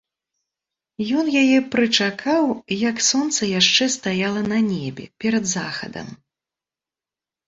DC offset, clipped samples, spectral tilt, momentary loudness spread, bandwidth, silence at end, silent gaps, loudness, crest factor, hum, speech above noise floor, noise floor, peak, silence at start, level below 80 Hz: under 0.1%; under 0.1%; -3 dB/octave; 13 LU; 8 kHz; 1.3 s; none; -19 LUFS; 18 dB; none; 70 dB; -90 dBFS; -2 dBFS; 1 s; -60 dBFS